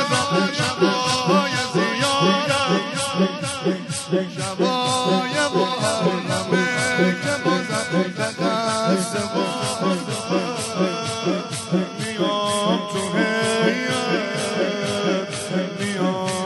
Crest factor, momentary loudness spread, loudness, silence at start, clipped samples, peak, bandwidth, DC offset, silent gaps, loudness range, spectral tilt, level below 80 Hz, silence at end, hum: 16 dB; 5 LU; -21 LUFS; 0 s; under 0.1%; -6 dBFS; 11.5 kHz; under 0.1%; none; 3 LU; -4 dB/octave; -60 dBFS; 0 s; none